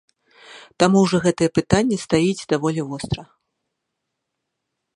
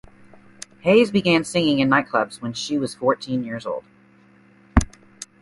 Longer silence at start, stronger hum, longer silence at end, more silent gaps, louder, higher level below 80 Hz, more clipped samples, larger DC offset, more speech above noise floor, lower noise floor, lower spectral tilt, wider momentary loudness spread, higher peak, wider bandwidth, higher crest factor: second, 0.5 s vs 0.85 s; neither; first, 1.75 s vs 0.2 s; neither; about the same, -20 LUFS vs -21 LUFS; second, -48 dBFS vs -36 dBFS; neither; neither; first, 60 dB vs 33 dB; first, -79 dBFS vs -53 dBFS; about the same, -5.5 dB/octave vs -5 dB/octave; second, 11 LU vs 18 LU; about the same, 0 dBFS vs 0 dBFS; about the same, 11.5 kHz vs 11.5 kHz; about the same, 22 dB vs 22 dB